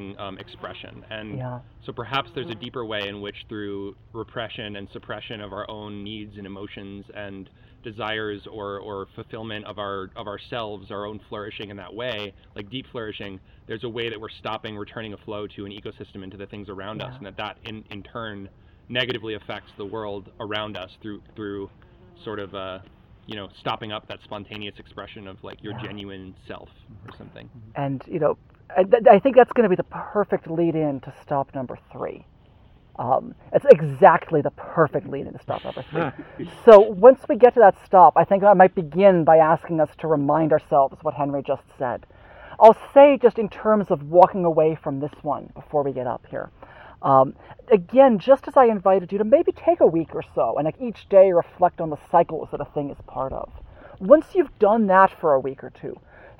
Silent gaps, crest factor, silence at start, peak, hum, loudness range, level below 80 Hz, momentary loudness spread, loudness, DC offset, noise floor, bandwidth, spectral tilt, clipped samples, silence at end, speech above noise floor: none; 22 dB; 0 s; 0 dBFS; none; 18 LU; -54 dBFS; 23 LU; -19 LUFS; under 0.1%; -52 dBFS; 6.2 kHz; -8 dB/octave; under 0.1%; 0.45 s; 31 dB